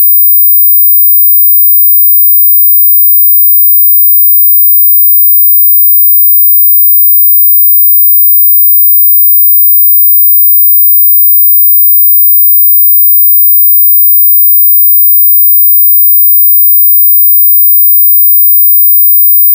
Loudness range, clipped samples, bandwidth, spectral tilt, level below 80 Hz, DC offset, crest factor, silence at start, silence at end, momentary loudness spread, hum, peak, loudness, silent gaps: 0 LU; under 0.1%; 16 kHz; 0.5 dB/octave; under -90 dBFS; under 0.1%; 4 dB; 0 s; 0 s; 0 LU; none; 0 dBFS; 0 LUFS; none